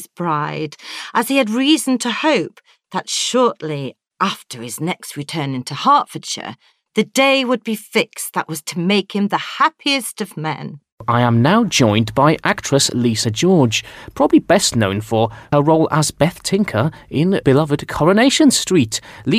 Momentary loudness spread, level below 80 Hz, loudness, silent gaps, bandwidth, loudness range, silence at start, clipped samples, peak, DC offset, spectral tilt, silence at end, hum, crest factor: 12 LU; -50 dBFS; -17 LUFS; 10.92-10.98 s; 16 kHz; 5 LU; 0 s; under 0.1%; -2 dBFS; under 0.1%; -4.5 dB/octave; 0 s; none; 16 dB